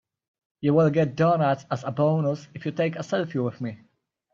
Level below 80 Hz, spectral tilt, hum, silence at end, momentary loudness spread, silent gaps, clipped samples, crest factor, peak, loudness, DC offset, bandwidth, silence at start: -66 dBFS; -8 dB/octave; none; 0.55 s; 10 LU; none; under 0.1%; 16 dB; -8 dBFS; -24 LUFS; under 0.1%; 7.4 kHz; 0.6 s